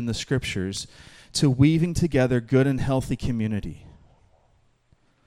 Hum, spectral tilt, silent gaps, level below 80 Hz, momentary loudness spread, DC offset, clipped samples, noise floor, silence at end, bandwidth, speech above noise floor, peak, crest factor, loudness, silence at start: none; -6 dB/octave; none; -42 dBFS; 12 LU; under 0.1%; under 0.1%; -63 dBFS; 1.35 s; 13.5 kHz; 40 dB; -6 dBFS; 18 dB; -24 LUFS; 0 s